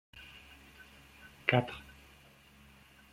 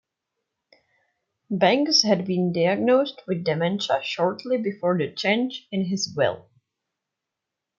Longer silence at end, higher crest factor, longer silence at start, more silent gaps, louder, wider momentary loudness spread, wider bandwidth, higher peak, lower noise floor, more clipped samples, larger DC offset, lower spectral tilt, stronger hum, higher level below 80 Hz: about the same, 1.3 s vs 1.4 s; first, 32 dB vs 20 dB; second, 0.15 s vs 1.5 s; neither; second, -32 LUFS vs -23 LUFS; first, 28 LU vs 9 LU; first, 16 kHz vs 7.6 kHz; second, -8 dBFS vs -4 dBFS; second, -60 dBFS vs -85 dBFS; neither; neither; first, -6.5 dB/octave vs -4.5 dB/octave; neither; first, -64 dBFS vs -72 dBFS